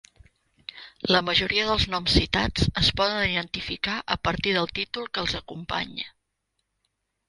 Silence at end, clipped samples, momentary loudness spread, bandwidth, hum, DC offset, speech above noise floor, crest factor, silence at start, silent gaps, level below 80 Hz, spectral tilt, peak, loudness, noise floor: 1.2 s; under 0.1%; 13 LU; 11.5 kHz; none; under 0.1%; 52 dB; 22 dB; 0.75 s; none; -40 dBFS; -4.5 dB/octave; -4 dBFS; -24 LUFS; -78 dBFS